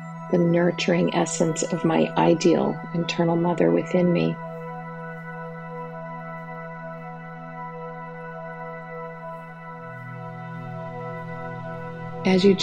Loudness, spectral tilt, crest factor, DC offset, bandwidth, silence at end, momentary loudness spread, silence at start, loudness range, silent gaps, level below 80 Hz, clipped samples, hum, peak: -25 LUFS; -6 dB/octave; 20 dB; under 0.1%; 9.4 kHz; 0 s; 16 LU; 0 s; 14 LU; none; -64 dBFS; under 0.1%; none; -6 dBFS